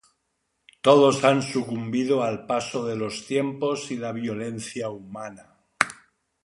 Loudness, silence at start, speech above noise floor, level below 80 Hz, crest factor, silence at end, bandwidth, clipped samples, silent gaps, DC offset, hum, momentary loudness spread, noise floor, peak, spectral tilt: -24 LUFS; 0.85 s; 52 dB; -66 dBFS; 24 dB; 0.5 s; 11.5 kHz; under 0.1%; none; under 0.1%; none; 15 LU; -75 dBFS; 0 dBFS; -5 dB/octave